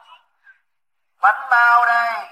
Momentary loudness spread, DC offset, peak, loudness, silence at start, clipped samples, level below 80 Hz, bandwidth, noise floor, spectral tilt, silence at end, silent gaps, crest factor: 6 LU; under 0.1%; -2 dBFS; -15 LUFS; 1.2 s; under 0.1%; -84 dBFS; 16 kHz; -79 dBFS; 0.5 dB/octave; 0.05 s; none; 16 dB